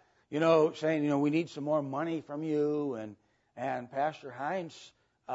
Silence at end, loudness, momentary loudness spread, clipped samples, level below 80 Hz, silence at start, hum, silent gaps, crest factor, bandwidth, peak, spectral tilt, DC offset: 0 s; -32 LUFS; 13 LU; under 0.1%; -82 dBFS; 0.3 s; none; none; 18 dB; 8 kHz; -14 dBFS; -7 dB/octave; under 0.1%